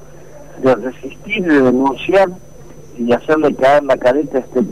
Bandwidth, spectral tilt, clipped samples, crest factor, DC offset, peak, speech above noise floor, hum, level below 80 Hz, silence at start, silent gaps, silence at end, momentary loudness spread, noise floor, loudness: 14.5 kHz; -6.5 dB/octave; under 0.1%; 10 dB; 1%; -6 dBFS; 24 dB; none; -46 dBFS; 0.35 s; none; 0 s; 9 LU; -38 dBFS; -14 LUFS